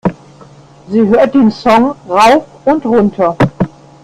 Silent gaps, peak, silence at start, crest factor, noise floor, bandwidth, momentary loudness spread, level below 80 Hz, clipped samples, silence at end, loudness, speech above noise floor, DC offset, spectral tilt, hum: none; 0 dBFS; 0.05 s; 12 dB; -38 dBFS; 13.5 kHz; 9 LU; -40 dBFS; under 0.1%; 0.35 s; -11 LUFS; 29 dB; under 0.1%; -6.5 dB/octave; none